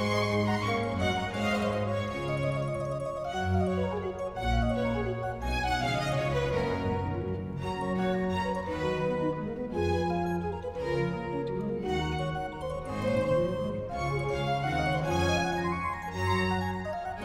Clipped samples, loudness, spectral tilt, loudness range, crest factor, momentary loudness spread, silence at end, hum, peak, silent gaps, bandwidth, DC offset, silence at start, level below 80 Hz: under 0.1%; -30 LUFS; -6.5 dB/octave; 2 LU; 14 dB; 6 LU; 0 s; none; -16 dBFS; none; 15.5 kHz; under 0.1%; 0 s; -44 dBFS